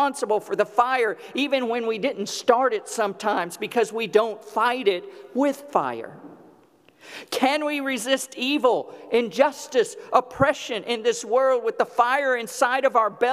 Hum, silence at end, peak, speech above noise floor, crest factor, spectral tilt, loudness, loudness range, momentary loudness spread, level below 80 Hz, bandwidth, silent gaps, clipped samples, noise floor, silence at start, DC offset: none; 0 s; -2 dBFS; 33 dB; 20 dB; -3.5 dB/octave; -23 LUFS; 4 LU; 7 LU; -64 dBFS; 15.5 kHz; none; under 0.1%; -56 dBFS; 0 s; under 0.1%